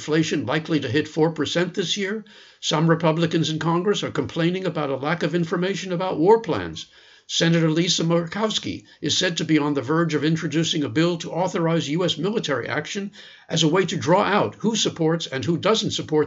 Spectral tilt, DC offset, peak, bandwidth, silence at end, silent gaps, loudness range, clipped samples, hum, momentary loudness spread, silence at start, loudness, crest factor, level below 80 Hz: -5 dB/octave; under 0.1%; -4 dBFS; 8 kHz; 0 s; none; 2 LU; under 0.1%; none; 7 LU; 0 s; -22 LUFS; 18 dB; -64 dBFS